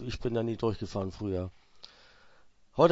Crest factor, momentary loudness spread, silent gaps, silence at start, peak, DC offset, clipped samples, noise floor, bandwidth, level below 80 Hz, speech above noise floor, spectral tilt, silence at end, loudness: 24 dB; 22 LU; none; 0 s; -8 dBFS; under 0.1%; under 0.1%; -58 dBFS; 8 kHz; -52 dBFS; 25 dB; -7.5 dB/octave; 0 s; -33 LUFS